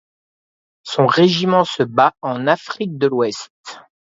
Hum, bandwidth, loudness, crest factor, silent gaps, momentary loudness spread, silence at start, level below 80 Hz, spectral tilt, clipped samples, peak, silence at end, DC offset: none; 7.8 kHz; -17 LUFS; 18 dB; 3.50-3.64 s; 20 LU; 0.85 s; -64 dBFS; -5.5 dB/octave; under 0.1%; 0 dBFS; 0.35 s; under 0.1%